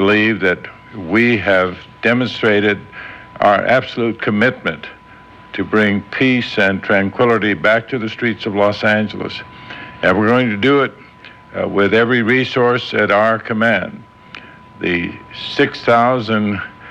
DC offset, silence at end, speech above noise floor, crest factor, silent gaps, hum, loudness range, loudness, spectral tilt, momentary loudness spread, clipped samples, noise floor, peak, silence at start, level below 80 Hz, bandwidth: under 0.1%; 0 s; 25 dB; 12 dB; none; none; 2 LU; -15 LUFS; -6.5 dB/octave; 16 LU; under 0.1%; -41 dBFS; -4 dBFS; 0 s; -52 dBFS; 8.8 kHz